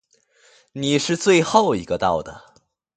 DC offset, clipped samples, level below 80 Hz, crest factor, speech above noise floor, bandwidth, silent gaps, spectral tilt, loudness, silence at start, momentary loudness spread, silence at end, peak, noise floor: under 0.1%; under 0.1%; -52 dBFS; 20 dB; 39 dB; 9.4 kHz; none; -4.5 dB/octave; -19 LUFS; 0.75 s; 14 LU; 0.6 s; 0 dBFS; -58 dBFS